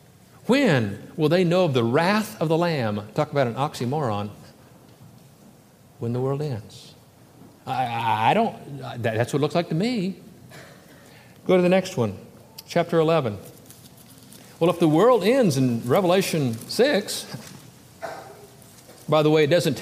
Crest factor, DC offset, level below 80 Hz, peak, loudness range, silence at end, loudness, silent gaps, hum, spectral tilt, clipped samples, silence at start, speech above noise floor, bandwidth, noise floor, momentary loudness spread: 18 dB; under 0.1%; -66 dBFS; -6 dBFS; 8 LU; 0 s; -22 LUFS; none; none; -6 dB/octave; under 0.1%; 0.45 s; 30 dB; 15.5 kHz; -52 dBFS; 18 LU